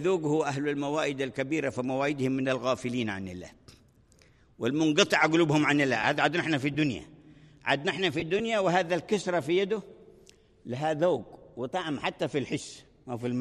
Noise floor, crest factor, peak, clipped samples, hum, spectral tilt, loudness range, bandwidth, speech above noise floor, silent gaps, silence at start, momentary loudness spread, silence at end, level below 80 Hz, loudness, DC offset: -60 dBFS; 22 dB; -8 dBFS; under 0.1%; none; -5 dB/octave; 6 LU; 13 kHz; 32 dB; none; 0 s; 13 LU; 0 s; -64 dBFS; -28 LUFS; under 0.1%